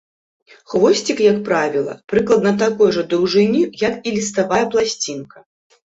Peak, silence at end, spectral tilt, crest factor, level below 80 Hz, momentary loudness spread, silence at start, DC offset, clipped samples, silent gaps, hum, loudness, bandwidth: -2 dBFS; 0.45 s; -4.5 dB/octave; 16 dB; -56 dBFS; 7 LU; 0.7 s; under 0.1%; under 0.1%; 2.04-2.08 s; none; -17 LUFS; 8 kHz